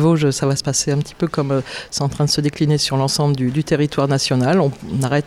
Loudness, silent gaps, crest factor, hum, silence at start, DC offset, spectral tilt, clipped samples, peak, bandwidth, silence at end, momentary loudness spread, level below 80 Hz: -18 LUFS; none; 12 dB; none; 0 s; under 0.1%; -5 dB/octave; under 0.1%; -6 dBFS; 14 kHz; 0 s; 6 LU; -46 dBFS